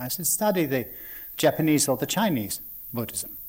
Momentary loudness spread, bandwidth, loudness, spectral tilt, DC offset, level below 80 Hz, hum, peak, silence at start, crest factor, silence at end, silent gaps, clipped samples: 12 LU; 17.5 kHz; -25 LUFS; -4 dB/octave; under 0.1%; -58 dBFS; none; -10 dBFS; 0 s; 16 dB; 0 s; none; under 0.1%